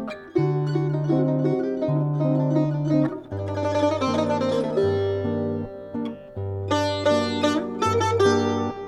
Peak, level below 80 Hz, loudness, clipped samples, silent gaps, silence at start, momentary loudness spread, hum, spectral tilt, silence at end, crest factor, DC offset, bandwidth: -8 dBFS; -56 dBFS; -23 LUFS; under 0.1%; none; 0 s; 10 LU; none; -7 dB/octave; 0 s; 14 dB; under 0.1%; 11.5 kHz